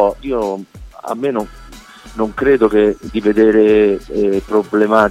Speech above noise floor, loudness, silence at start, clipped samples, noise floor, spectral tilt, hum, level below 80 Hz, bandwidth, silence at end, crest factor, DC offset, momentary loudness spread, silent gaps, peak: 23 dB; -15 LUFS; 0 s; under 0.1%; -37 dBFS; -6.5 dB/octave; none; -38 dBFS; 12 kHz; 0 s; 14 dB; under 0.1%; 14 LU; none; 0 dBFS